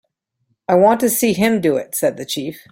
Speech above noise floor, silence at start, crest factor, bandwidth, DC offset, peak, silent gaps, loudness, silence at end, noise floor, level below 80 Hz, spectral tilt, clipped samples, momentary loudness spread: 52 dB; 0.7 s; 16 dB; 16.5 kHz; under 0.1%; -2 dBFS; none; -17 LUFS; 0.1 s; -69 dBFS; -56 dBFS; -4.5 dB/octave; under 0.1%; 11 LU